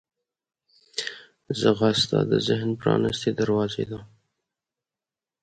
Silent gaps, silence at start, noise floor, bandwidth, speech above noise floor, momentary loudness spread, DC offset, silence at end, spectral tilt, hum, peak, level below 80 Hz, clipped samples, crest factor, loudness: none; 0.95 s; under -90 dBFS; 9.4 kHz; over 67 dB; 12 LU; under 0.1%; 1.35 s; -5.5 dB/octave; none; -6 dBFS; -58 dBFS; under 0.1%; 20 dB; -24 LUFS